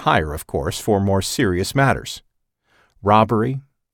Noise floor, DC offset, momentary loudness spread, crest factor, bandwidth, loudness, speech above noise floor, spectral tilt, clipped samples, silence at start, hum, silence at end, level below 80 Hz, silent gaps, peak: -64 dBFS; under 0.1%; 10 LU; 18 dB; 18 kHz; -19 LUFS; 46 dB; -5.5 dB/octave; under 0.1%; 0 s; none; 0.35 s; -40 dBFS; none; -2 dBFS